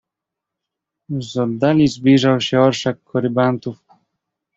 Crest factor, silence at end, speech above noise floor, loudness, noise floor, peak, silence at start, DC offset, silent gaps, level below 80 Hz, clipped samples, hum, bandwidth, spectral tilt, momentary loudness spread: 16 dB; 0.8 s; 67 dB; -17 LUFS; -83 dBFS; -2 dBFS; 1.1 s; under 0.1%; none; -54 dBFS; under 0.1%; none; 7.8 kHz; -6.5 dB/octave; 13 LU